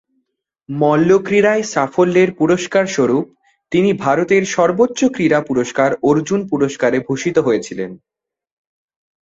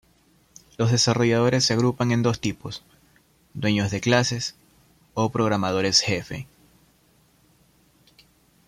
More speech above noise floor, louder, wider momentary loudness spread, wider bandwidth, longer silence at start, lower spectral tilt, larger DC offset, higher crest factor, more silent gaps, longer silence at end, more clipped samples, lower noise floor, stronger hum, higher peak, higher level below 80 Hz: first, 56 dB vs 38 dB; first, -15 LUFS vs -22 LUFS; second, 6 LU vs 17 LU; second, 7.8 kHz vs 14.5 kHz; about the same, 0.7 s vs 0.8 s; about the same, -5.5 dB/octave vs -4.5 dB/octave; neither; second, 14 dB vs 20 dB; neither; second, 1.3 s vs 2.25 s; neither; first, -71 dBFS vs -60 dBFS; neither; first, -2 dBFS vs -6 dBFS; about the same, -56 dBFS vs -56 dBFS